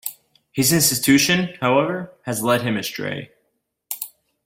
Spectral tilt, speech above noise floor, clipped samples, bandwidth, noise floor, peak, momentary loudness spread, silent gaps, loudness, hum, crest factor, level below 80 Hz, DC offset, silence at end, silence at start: -3.5 dB/octave; 52 dB; under 0.1%; 16.5 kHz; -72 dBFS; -4 dBFS; 16 LU; none; -19 LUFS; none; 18 dB; -58 dBFS; under 0.1%; 0.4 s; 0.05 s